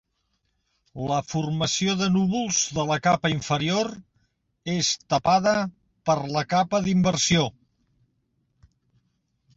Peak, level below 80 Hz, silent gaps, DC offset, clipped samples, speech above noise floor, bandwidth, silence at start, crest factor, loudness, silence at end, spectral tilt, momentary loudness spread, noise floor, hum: -8 dBFS; -54 dBFS; none; under 0.1%; under 0.1%; 50 dB; 8 kHz; 0.95 s; 18 dB; -24 LUFS; 2.05 s; -4 dB/octave; 8 LU; -74 dBFS; none